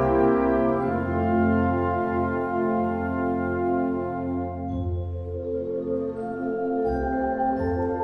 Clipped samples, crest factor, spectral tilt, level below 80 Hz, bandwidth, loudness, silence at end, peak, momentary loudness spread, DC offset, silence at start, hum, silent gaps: under 0.1%; 16 dB; -10.5 dB/octave; -42 dBFS; 5.6 kHz; -25 LUFS; 0 s; -10 dBFS; 8 LU; under 0.1%; 0 s; none; none